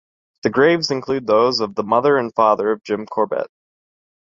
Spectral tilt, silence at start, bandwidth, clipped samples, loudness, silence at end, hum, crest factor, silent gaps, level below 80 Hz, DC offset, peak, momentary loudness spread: -5 dB/octave; 0.45 s; 7.6 kHz; under 0.1%; -18 LUFS; 0.85 s; none; 18 dB; none; -60 dBFS; under 0.1%; -2 dBFS; 8 LU